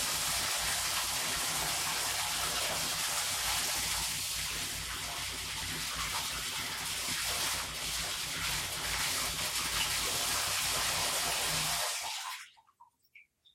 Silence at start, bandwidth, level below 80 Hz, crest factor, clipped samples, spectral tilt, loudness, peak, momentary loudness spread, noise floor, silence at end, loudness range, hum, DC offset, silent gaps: 0 s; 16.5 kHz; -54 dBFS; 16 dB; under 0.1%; 0 dB/octave; -32 LUFS; -18 dBFS; 5 LU; -64 dBFS; 0.35 s; 3 LU; none; under 0.1%; none